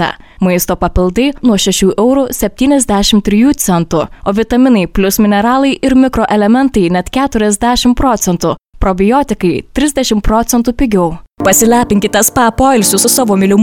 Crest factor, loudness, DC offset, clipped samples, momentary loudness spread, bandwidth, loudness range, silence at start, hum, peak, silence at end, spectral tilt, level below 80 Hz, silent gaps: 10 dB; -11 LUFS; under 0.1%; under 0.1%; 6 LU; 18.5 kHz; 2 LU; 0 s; none; 0 dBFS; 0 s; -4.5 dB/octave; -26 dBFS; none